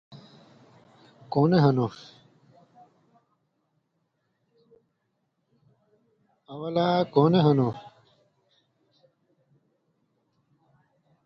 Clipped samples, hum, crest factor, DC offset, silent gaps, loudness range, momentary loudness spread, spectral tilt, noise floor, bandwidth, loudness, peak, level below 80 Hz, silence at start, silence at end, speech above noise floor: under 0.1%; none; 22 dB; under 0.1%; none; 8 LU; 20 LU; -9 dB/octave; -76 dBFS; 6.6 kHz; -23 LUFS; -8 dBFS; -66 dBFS; 0.1 s; 3.35 s; 54 dB